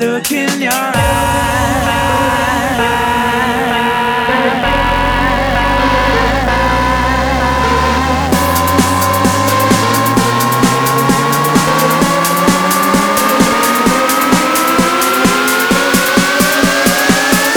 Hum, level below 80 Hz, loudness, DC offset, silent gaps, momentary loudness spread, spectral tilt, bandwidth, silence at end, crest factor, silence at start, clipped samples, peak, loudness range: none; -26 dBFS; -11 LUFS; under 0.1%; none; 3 LU; -4 dB/octave; over 20 kHz; 0 s; 12 dB; 0 s; under 0.1%; 0 dBFS; 2 LU